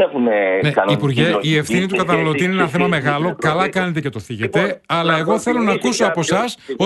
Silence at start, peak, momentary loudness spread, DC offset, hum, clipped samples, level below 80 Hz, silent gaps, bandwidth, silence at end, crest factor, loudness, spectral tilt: 0 s; 0 dBFS; 4 LU; under 0.1%; none; under 0.1%; -52 dBFS; none; 12 kHz; 0 s; 16 dB; -17 LUFS; -5.5 dB/octave